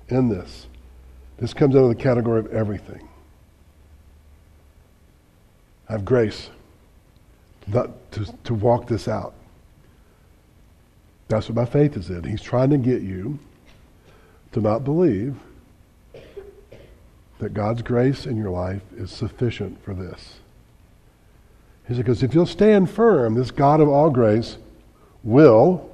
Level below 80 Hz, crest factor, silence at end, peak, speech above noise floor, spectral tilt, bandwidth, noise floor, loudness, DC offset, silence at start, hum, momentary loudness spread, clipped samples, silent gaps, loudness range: -48 dBFS; 22 dB; 0.05 s; 0 dBFS; 35 dB; -8.5 dB/octave; 11 kHz; -54 dBFS; -20 LUFS; under 0.1%; 0.1 s; none; 19 LU; under 0.1%; none; 11 LU